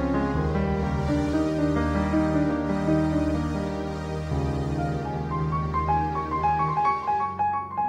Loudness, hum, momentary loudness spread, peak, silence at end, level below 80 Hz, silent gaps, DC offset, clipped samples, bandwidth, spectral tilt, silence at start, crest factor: -26 LUFS; none; 5 LU; -12 dBFS; 0 s; -36 dBFS; none; under 0.1%; under 0.1%; 10.5 kHz; -8 dB/octave; 0 s; 14 dB